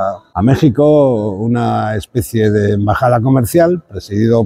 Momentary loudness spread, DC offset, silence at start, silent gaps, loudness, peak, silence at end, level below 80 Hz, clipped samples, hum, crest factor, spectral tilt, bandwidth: 8 LU; under 0.1%; 0 s; none; -13 LUFS; 0 dBFS; 0 s; -38 dBFS; under 0.1%; none; 12 dB; -7.5 dB/octave; 16 kHz